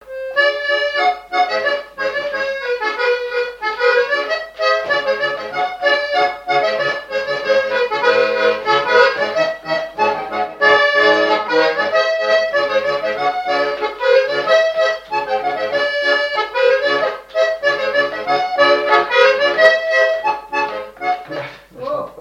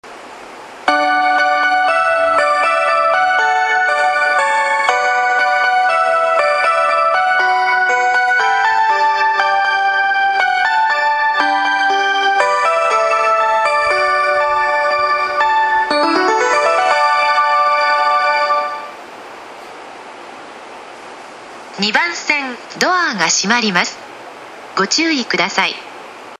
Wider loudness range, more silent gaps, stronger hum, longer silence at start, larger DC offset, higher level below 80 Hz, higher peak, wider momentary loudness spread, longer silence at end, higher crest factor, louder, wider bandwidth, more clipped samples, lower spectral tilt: second, 3 LU vs 6 LU; neither; neither; about the same, 0.05 s vs 0.05 s; neither; about the same, -56 dBFS vs -58 dBFS; about the same, 0 dBFS vs 0 dBFS; second, 9 LU vs 20 LU; about the same, 0 s vs 0.05 s; about the same, 16 dB vs 14 dB; second, -16 LUFS vs -13 LUFS; second, 10.5 kHz vs 12 kHz; neither; about the same, -2.5 dB/octave vs -1.5 dB/octave